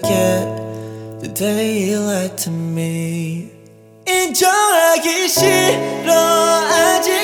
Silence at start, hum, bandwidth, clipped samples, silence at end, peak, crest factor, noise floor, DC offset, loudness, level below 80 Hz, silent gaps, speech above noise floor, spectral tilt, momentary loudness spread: 0 s; none; 19.5 kHz; under 0.1%; 0 s; -2 dBFS; 14 dB; -43 dBFS; under 0.1%; -15 LUFS; -58 dBFS; none; 28 dB; -3.5 dB/octave; 14 LU